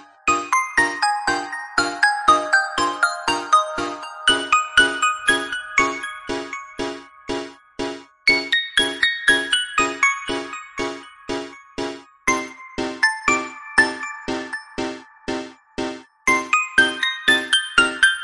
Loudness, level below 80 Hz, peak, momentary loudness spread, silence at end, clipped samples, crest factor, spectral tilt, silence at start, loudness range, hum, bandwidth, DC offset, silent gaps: -20 LUFS; -50 dBFS; -2 dBFS; 14 LU; 0 s; under 0.1%; 18 dB; -1 dB/octave; 0 s; 5 LU; none; 11.5 kHz; under 0.1%; none